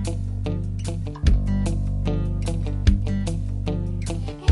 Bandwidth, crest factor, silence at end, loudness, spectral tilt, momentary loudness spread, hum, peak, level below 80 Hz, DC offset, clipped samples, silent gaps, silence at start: 11.5 kHz; 20 dB; 0 s; -25 LUFS; -7 dB/octave; 6 LU; none; -4 dBFS; -26 dBFS; under 0.1%; under 0.1%; none; 0 s